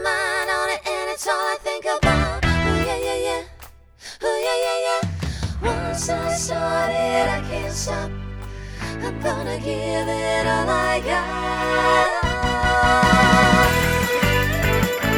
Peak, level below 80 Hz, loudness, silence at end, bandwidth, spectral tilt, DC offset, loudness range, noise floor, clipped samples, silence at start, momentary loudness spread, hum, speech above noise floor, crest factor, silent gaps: -2 dBFS; -32 dBFS; -20 LUFS; 0 s; over 20 kHz; -4.5 dB/octave; under 0.1%; 7 LU; -44 dBFS; under 0.1%; 0 s; 12 LU; none; 22 dB; 18 dB; none